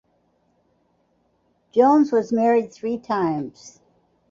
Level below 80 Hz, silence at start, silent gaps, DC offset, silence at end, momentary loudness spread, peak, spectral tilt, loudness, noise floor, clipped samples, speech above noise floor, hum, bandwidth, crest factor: -68 dBFS; 1.75 s; none; under 0.1%; 0.6 s; 13 LU; -4 dBFS; -7 dB/octave; -20 LUFS; -66 dBFS; under 0.1%; 46 dB; none; 7.6 kHz; 18 dB